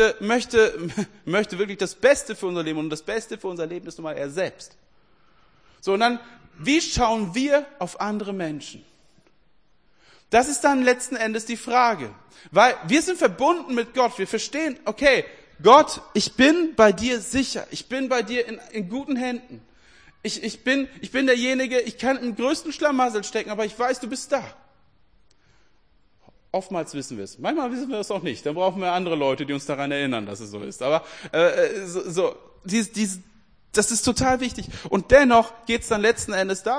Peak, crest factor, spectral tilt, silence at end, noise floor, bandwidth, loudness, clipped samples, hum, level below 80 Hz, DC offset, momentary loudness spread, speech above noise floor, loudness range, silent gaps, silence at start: 0 dBFS; 22 dB; -3.5 dB/octave; 0 s; -64 dBFS; 10.5 kHz; -22 LUFS; under 0.1%; none; -50 dBFS; 0.1%; 13 LU; 42 dB; 10 LU; none; 0 s